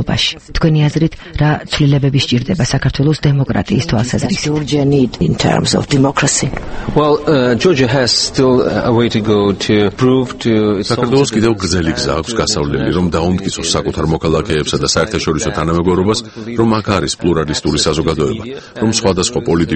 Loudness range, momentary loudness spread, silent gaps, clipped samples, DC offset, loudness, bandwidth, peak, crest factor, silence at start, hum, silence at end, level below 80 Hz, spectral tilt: 3 LU; 4 LU; none; under 0.1%; under 0.1%; -14 LUFS; 8.8 kHz; 0 dBFS; 14 dB; 0 s; none; 0 s; -32 dBFS; -5 dB/octave